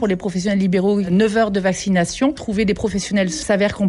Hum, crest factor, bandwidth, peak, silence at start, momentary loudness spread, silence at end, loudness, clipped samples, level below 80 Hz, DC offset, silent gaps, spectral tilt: none; 12 dB; 11.5 kHz; -6 dBFS; 0 s; 4 LU; 0 s; -18 LUFS; under 0.1%; -42 dBFS; under 0.1%; none; -5.5 dB/octave